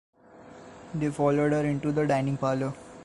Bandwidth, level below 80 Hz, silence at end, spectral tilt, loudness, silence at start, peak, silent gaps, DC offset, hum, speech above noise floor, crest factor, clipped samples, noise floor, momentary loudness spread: 11.5 kHz; -58 dBFS; 0 s; -7.5 dB/octave; -27 LUFS; 0.35 s; -12 dBFS; none; under 0.1%; none; 24 dB; 16 dB; under 0.1%; -50 dBFS; 20 LU